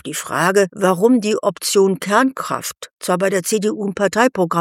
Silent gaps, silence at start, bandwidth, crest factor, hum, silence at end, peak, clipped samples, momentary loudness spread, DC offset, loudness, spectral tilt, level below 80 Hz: 2.93-2.97 s; 0.05 s; 16.5 kHz; 16 dB; none; 0 s; -2 dBFS; under 0.1%; 8 LU; under 0.1%; -17 LUFS; -4.5 dB/octave; -64 dBFS